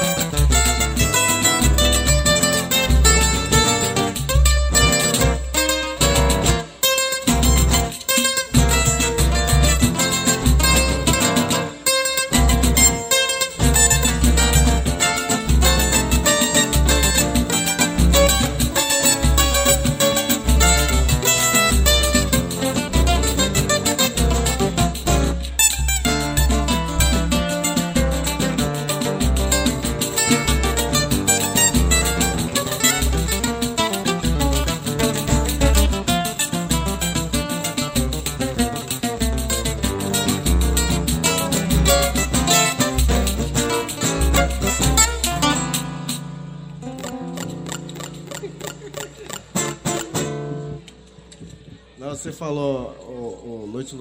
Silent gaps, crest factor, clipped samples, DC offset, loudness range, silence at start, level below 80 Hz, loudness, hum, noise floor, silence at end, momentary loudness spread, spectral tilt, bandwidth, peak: none; 18 dB; under 0.1%; under 0.1%; 12 LU; 0 s; -24 dBFS; -17 LUFS; none; -44 dBFS; 0 s; 12 LU; -3 dB/octave; 16.5 kHz; 0 dBFS